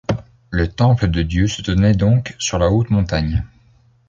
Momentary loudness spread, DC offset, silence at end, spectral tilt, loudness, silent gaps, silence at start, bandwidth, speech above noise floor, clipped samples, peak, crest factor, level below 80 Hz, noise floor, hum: 10 LU; under 0.1%; 0.65 s; -6 dB/octave; -18 LUFS; none; 0.1 s; 7.8 kHz; 37 dB; under 0.1%; -4 dBFS; 14 dB; -28 dBFS; -53 dBFS; none